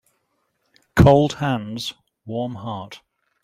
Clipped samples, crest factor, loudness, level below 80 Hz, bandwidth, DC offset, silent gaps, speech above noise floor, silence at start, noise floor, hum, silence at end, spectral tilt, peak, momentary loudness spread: under 0.1%; 20 dB; -20 LUFS; -38 dBFS; 15 kHz; under 0.1%; none; 50 dB; 0.95 s; -71 dBFS; none; 0.45 s; -7 dB/octave; 0 dBFS; 17 LU